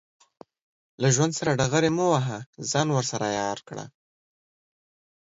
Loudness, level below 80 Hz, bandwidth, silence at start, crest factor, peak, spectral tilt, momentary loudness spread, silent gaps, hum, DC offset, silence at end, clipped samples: -25 LUFS; -60 dBFS; 8 kHz; 1 s; 18 dB; -8 dBFS; -4.5 dB/octave; 13 LU; 2.46-2.53 s; none; under 0.1%; 1.35 s; under 0.1%